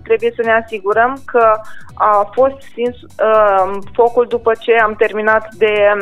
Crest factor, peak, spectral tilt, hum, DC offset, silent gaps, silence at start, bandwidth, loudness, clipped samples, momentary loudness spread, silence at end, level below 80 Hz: 12 dB; 0 dBFS; -5.5 dB/octave; none; under 0.1%; none; 0.05 s; 11 kHz; -14 LUFS; under 0.1%; 7 LU; 0 s; -48 dBFS